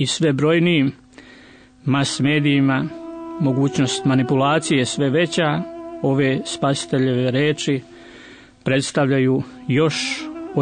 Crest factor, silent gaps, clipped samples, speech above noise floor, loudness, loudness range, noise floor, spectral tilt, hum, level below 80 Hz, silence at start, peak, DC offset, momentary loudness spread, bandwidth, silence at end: 14 dB; none; under 0.1%; 28 dB; -19 LUFS; 2 LU; -46 dBFS; -5.5 dB/octave; none; -58 dBFS; 0 s; -6 dBFS; under 0.1%; 9 LU; 9.6 kHz; 0 s